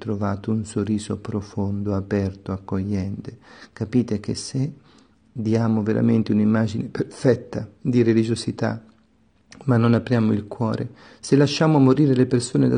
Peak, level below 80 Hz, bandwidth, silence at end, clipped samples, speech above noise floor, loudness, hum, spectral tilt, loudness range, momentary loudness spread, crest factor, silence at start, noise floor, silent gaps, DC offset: -4 dBFS; -56 dBFS; 10 kHz; 0 s; under 0.1%; 39 dB; -22 LUFS; none; -7 dB/octave; 7 LU; 12 LU; 18 dB; 0 s; -60 dBFS; none; under 0.1%